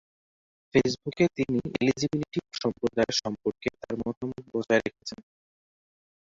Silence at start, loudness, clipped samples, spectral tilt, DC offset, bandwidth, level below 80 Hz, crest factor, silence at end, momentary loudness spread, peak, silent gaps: 0.75 s; -28 LUFS; under 0.1%; -5 dB/octave; under 0.1%; 7.8 kHz; -58 dBFS; 22 dB; 1.2 s; 10 LU; -6 dBFS; 4.17-4.21 s